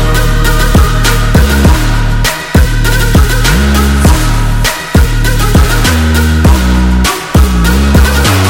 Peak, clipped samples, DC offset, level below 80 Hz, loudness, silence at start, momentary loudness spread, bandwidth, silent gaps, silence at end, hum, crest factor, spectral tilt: 0 dBFS; 0.3%; under 0.1%; -10 dBFS; -9 LUFS; 0 s; 3 LU; 17.5 kHz; none; 0 s; none; 6 dB; -5 dB/octave